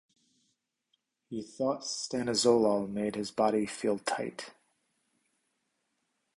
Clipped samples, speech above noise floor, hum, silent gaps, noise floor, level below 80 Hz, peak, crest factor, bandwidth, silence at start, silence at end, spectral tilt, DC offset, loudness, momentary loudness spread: under 0.1%; 50 dB; none; none; -80 dBFS; -70 dBFS; -12 dBFS; 22 dB; 11.5 kHz; 1.3 s; 1.85 s; -4 dB/octave; under 0.1%; -30 LUFS; 16 LU